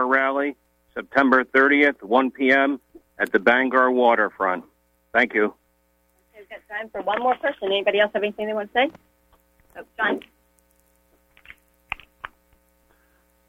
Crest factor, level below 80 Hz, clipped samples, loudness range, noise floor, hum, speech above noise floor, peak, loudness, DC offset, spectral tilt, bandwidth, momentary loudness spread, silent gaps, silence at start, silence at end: 18 dB; -62 dBFS; under 0.1%; 14 LU; -65 dBFS; none; 44 dB; -4 dBFS; -21 LUFS; under 0.1%; -5.5 dB/octave; 15 kHz; 17 LU; none; 0 s; 1.25 s